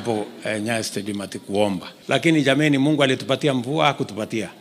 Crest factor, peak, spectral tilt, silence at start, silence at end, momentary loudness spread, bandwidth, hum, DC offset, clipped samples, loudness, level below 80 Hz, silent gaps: 18 dB; -4 dBFS; -5 dB/octave; 0 s; 0.05 s; 10 LU; 15.5 kHz; none; under 0.1%; under 0.1%; -21 LUFS; -68 dBFS; none